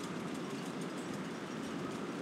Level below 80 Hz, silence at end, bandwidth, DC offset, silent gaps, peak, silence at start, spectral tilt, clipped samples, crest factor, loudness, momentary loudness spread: -76 dBFS; 0 s; 16 kHz; under 0.1%; none; -28 dBFS; 0 s; -5 dB/octave; under 0.1%; 12 dB; -41 LUFS; 1 LU